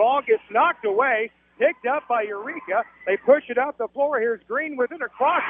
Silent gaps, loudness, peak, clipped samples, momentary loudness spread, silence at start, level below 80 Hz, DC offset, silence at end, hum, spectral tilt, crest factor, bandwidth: none; -23 LUFS; -4 dBFS; under 0.1%; 7 LU; 0 s; -70 dBFS; under 0.1%; 0 s; none; -7.5 dB/octave; 18 dB; 3.7 kHz